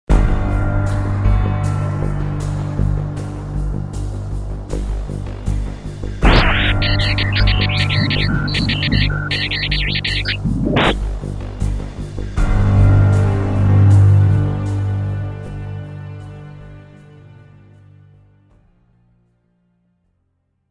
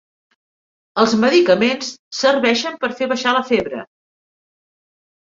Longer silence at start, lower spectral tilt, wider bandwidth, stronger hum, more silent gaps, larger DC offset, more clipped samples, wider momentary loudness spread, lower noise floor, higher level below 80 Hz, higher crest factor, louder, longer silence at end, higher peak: second, 0.1 s vs 0.95 s; first, -6.5 dB/octave vs -4 dB/octave; first, 10.5 kHz vs 7.8 kHz; neither; second, none vs 1.99-2.11 s; neither; neither; about the same, 15 LU vs 13 LU; second, -67 dBFS vs under -90 dBFS; first, -22 dBFS vs -60 dBFS; about the same, 16 dB vs 18 dB; about the same, -17 LUFS vs -17 LUFS; first, 3.4 s vs 1.4 s; about the same, 0 dBFS vs -2 dBFS